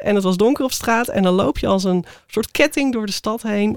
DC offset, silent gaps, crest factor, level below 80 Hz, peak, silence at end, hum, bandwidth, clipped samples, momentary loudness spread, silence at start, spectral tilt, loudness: 0.5%; none; 18 dB; -40 dBFS; 0 dBFS; 0 s; none; 18 kHz; under 0.1%; 6 LU; 0 s; -5 dB/octave; -19 LUFS